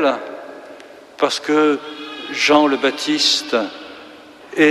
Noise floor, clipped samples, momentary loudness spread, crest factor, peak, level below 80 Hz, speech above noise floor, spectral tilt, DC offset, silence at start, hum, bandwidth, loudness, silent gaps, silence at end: -40 dBFS; under 0.1%; 22 LU; 16 dB; -2 dBFS; -64 dBFS; 23 dB; -2.5 dB/octave; under 0.1%; 0 s; none; 13.5 kHz; -17 LUFS; none; 0 s